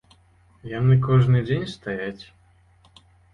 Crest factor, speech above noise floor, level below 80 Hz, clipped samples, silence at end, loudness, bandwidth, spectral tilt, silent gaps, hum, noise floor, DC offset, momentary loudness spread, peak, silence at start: 16 dB; 36 dB; -48 dBFS; under 0.1%; 1.1 s; -22 LUFS; 6.4 kHz; -8.5 dB/octave; none; none; -57 dBFS; under 0.1%; 18 LU; -8 dBFS; 0.65 s